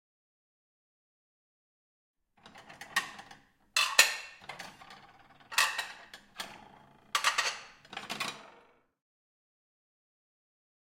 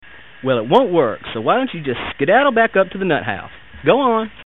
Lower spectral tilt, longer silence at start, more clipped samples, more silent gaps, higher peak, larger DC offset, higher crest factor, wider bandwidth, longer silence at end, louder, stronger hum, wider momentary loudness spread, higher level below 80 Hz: second, 1.5 dB/octave vs -8 dB/octave; first, 2.45 s vs 0.15 s; neither; neither; second, -4 dBFS vs 0 dBFS; second, under 0.1% vs 0.7%; first, 34 dB vs 16 dB; first, 16.5 kHz vs 4.2 kHz; first, 2.35 s vs 0.05 s; second, -30 LUFS vs -17 LUFS; neither; first, 25 LU vs 10 LU; second, -76 dBFS vs -50 dBFS